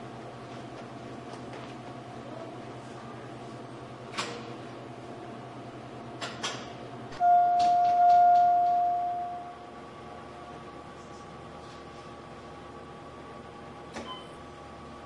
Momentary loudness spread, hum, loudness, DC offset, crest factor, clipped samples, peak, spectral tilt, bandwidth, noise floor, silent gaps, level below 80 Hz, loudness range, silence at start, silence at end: 22 LU; none; -26 LUFS; under 0.1%; 16 dB; under 0.1%; -14 dBFS; -5 dB/octave; 11 kHz; -45 dBFS; none; -64 dBFS; 20 LU; 0 s; 0 s